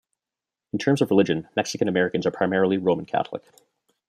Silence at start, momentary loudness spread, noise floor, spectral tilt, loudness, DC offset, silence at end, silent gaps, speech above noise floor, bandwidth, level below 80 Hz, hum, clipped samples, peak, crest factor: 0.75 s; 8 LU; -89 dBFS; -6 dB/octave; -23 LUFS; under 0.1%; 0.7 s; none; 66 dB; 14 kHz; -66 dBFS; none; under 0.1%; -4 dBFS; 20 dB